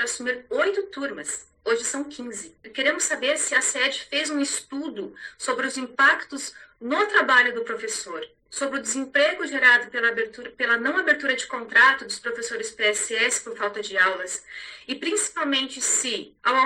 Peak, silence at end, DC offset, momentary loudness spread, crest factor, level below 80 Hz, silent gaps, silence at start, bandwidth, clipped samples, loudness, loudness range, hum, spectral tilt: -4 dBFS; 0 s; under 0.1%; 15 LU; 20 dB; -68 dBFS; none; 0 s; 16 kHz; under 0.1%; -23 LUFS; 4 LU; none; 0 dB/octave